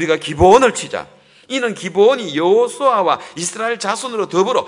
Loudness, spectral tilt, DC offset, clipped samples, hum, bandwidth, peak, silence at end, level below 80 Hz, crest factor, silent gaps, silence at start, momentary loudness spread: -15 LUFS; -4 dB/octave; under 0.1%; under 0.1%; none; 11 kHz; 0 dBFS; 0 s; -42 dBFS; 16 dB; none; 0 s; 13 LU